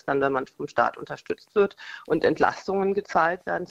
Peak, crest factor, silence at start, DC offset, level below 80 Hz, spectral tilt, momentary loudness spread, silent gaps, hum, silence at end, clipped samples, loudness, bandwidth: -4 dBFS; 20 dB; 0.05 s; under 0.1%; -60 dBFS; -6 dB/octave; 10 LU; none; none; 0.05 s; under 0.1%; -25 LUFS; 7.8 kHz